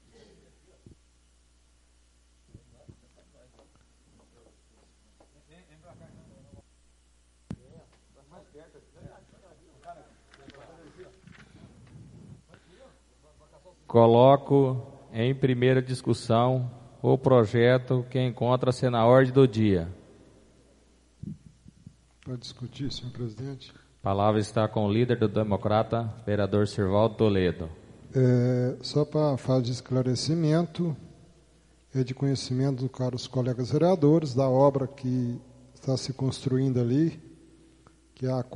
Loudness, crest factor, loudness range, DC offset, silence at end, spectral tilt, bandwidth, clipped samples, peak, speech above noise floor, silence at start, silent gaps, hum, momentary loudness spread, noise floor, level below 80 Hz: -25 LUFS; 22 dB; 8 LU; under 0.1%; 0 s; -7.5 dB/octave; 11 kHz; under 0.1%; -6 dBFS; 38 dB; 7.5 s; none; none; 17 LU; -62 dBFS; -58 dBFS